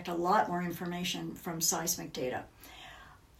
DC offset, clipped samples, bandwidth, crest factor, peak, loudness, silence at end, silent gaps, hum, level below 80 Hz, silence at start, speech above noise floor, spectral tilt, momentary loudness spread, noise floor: under 0.1%; under 0.1%; 16 kHz; 20 dB; -16 dBFS; -33 LUFS; 0.25 s; none; none; -62 dBFS; 0 s; 21 dB; -3 dB/octave; 21 LU; -54 dBFS